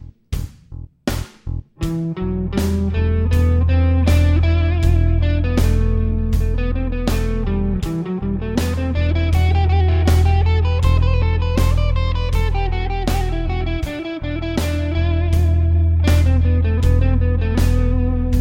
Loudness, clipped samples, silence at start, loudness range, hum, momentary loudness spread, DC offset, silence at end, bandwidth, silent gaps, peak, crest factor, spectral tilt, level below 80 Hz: -18 LUFS; under 0.1%; 0.05 s; 4 LU; none; 10 LU; 0.9%; 0 s; 16 kHz; none; -4 dBFS; 12 dB; -7 dB/octave; -20 dBFS